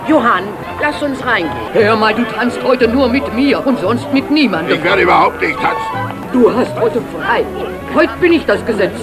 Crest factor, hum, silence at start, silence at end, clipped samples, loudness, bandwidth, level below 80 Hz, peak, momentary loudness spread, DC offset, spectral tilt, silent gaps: 14 dB; none; 0 s; 0 s; under 0.1%; -13 LUFS; 14.5 kHz; -40 dBFS; 0 dBFS; 7 LU; under 0.1%; -6 dB/octave; none